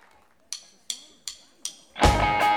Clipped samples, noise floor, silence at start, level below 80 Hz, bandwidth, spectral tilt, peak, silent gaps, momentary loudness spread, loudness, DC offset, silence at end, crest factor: under 0.1%; -59 dBFS; 0.5 s; -34 dBFS; 19 kHz; -3.5 dB/octave; -4 dBFS; none; 18 LU; -25 LUFS; under 0.1%; 0 s; 22 dB